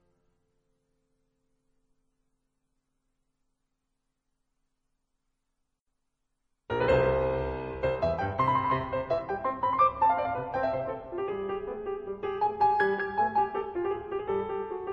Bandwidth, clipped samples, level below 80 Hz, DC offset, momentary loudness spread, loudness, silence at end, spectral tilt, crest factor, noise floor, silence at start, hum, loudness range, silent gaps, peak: 7.4 kHz; under 0.1%; -50 dBFS; under 0.1%; 10 LU; -29 LUFS; 0 s; -8 dB/octave; 18 dB; -80 dBFS; 6.7 s; none; 4 LU; none; -12 dBFS